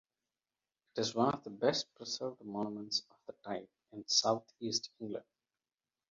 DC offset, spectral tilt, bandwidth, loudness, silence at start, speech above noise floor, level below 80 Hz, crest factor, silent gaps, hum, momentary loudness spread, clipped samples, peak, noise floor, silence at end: under 0.1%; -3 dB/octave; 7.4 kHz; -36 LUFS; 0.95 s; over 53 dB; -78 dBFS; 24 dB; none; none; 15 LU; under 0.1%; -16 dBFS; under -90 dBFS; 0.9 s